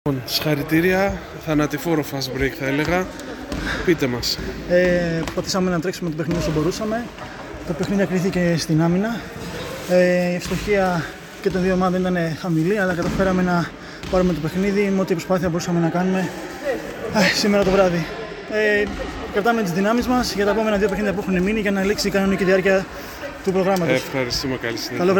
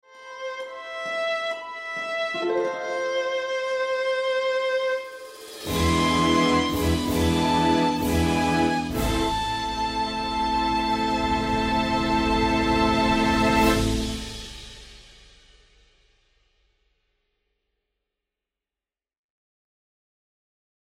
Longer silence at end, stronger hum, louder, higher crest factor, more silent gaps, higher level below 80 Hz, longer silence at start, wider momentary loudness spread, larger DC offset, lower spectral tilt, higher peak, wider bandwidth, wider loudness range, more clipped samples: second, 0 s vs 5.9 s; neither; first, -20 LUFS vs -24 LUFS; about the same, 16 dB vs 18 dB; neither; about the same, -40 dBFS vs -38 dBFS; about the same, 0.05 s vs 0.15 s; second, 10 LU vs 13 LU; neither; about the same, -5.5 dB/octave vs -5 dB/octave; first, -4 dBFS vs -8 dBFS; first, 19.5 kHz vs 16 kHz; second, 2 LU vs 6 LU; neither